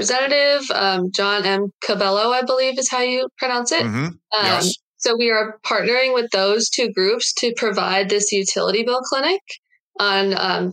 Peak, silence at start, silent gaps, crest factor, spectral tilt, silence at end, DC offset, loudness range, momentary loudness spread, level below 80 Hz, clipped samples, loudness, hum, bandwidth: -2 dBFS; 0 s; 1.74-1.79 s, 3.32-3.36 s, 4.82-4.94 s, 9.41-9.46 s, 9.58-9.63 s, 9.80-9.92 s; 18 dB; -2.5 dB/octave; 0 s; under 0.1%; 1 LU; 5 LU; -76 dBFS; under 0.1%; -18 LUFS; none; 16.5 kHz